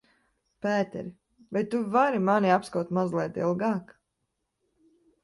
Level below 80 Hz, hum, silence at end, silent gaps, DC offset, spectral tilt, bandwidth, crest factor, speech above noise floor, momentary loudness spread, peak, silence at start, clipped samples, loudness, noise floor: -70 dBFS; none; 1.4 s; none; under 0.1%; -7 dB/octave; 11.5 kHz; 18 dB; 54 dB; 11 LU; -10 dBFS; 0.65 s; under 0.1%; -27 LUFS; -80 dBFS